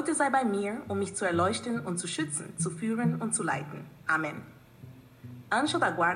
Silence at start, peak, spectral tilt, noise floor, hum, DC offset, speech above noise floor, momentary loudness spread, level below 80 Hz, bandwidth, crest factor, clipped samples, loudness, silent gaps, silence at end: 0 s; -14 dBFS; -4 dB/octave; -50 dBFS; none; under 0.1%; 21 dB; 11 LU; -70 dBFS; 13 kHz; 16 dB; under 0.1%; -30 LUFS; none; 0 s